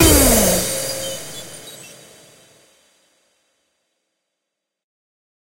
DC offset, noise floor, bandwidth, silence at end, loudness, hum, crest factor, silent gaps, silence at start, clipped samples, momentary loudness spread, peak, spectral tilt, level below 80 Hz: under 0.1%; -81 dBFS; 16 kHz; 3.65 s; -16 LUFS; none; 22 dB; none; 0 s; under 0.1%; 25 LU; 0 dBFS; -3 dB/octave; -32 dBFS